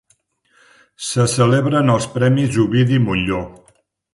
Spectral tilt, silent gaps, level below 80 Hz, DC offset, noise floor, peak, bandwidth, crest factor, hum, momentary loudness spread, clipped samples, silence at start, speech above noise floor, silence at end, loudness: -6 dB/octave; none; -44 dBFS; under 0.1%; -61 dBFS; -2 dBFS; 11.5 kHz; 16 dB; none; 9 LU; under 0.1%; 1 s; 46 dB; 0.6 s; -16 LUFS